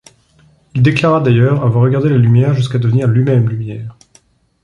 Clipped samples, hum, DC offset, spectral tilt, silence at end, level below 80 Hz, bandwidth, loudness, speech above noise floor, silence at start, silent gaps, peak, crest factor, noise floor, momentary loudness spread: under 0.1%; none; under 0.1%; -8.5 dB/octave; 0.7 s; -46 dBFS; 7.4 kHz; -12 LUFS; 40 dB; 0.75 s; none; 0 dBFS; 12 dB; -51 dBFS; 12 LU